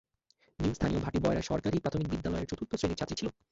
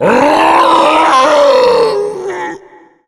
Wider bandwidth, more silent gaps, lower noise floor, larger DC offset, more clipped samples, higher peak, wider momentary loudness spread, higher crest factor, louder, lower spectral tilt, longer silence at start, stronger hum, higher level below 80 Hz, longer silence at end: second, 8 kHz vs 14 kHz; neither; first, -71 dBFS vs -40 dBFS; neither; neither; second, -16 dBFS vs 0 dBFS; second, 5 LU vs 12 LU; first, 18 dB vs 10 dB; second, -33 LUFS vs -8 LUFS; first, -6.5 dB/octave vs -4 dB/octave; first, 0.6 s vs 0 s; neither; about the same, -46 dBFS vs -48 dBFS; second, 0.2 s vs 0.5 s